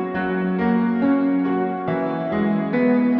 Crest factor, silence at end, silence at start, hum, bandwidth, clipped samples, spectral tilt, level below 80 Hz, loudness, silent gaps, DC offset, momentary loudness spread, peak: 12 dB; 0 s; 0 s; none; 5.2 kHz; under 0.1%; -10.5 dB/octave; -56 dBFS; -21 LUFS; none; under 0.1%; 5 LU; -8 dBFS